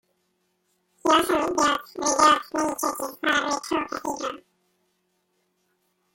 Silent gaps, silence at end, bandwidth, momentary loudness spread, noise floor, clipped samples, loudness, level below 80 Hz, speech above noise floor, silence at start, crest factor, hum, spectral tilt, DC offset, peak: none; 1.75 s; 17 kHz; 12 LU; -72 dBFS; under 0.1%; -23 LUFS; -60 dBFS; 49 dB; 1.05 s; 20 dB; none; -1.5 dB/octave; under 0.1%; -6 dBFS